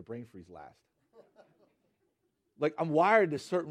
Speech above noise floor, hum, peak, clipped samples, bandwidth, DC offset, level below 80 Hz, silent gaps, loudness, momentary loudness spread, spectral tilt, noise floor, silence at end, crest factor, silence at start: 48 dB; none; -10 dBFS; under 0.1%; 12 kHz; under 0.1%; -78 dBFS; none; -28 LUFS; 25 LU; -6.5 dB/octave; -79 dBFS; 0 s; 22 dB; 0.1 s